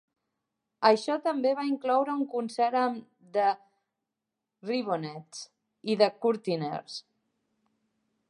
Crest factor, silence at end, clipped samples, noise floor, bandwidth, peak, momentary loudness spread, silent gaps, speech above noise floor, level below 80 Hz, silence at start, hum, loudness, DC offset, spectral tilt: 24 dB; 1.3 s; under 0.1%; -87 dBFS; 11 kHz; -6 dBFS; 17 LU; none; 59 dB; -86 dBFS; 0.8 s; none; -28 LUFS; under 0.1%; -5 dB/octave